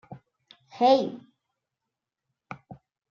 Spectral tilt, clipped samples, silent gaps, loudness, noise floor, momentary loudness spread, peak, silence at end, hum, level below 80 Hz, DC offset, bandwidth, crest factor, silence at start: -6 dB/octave; under 0.1%; none; -23 LUFS; -87 dBFS; 24 LU; -8 dBFS; 0.35 s; none; -76 dBFS; under 0.1%; 7.2 kHz; 22 dB; 0.1 s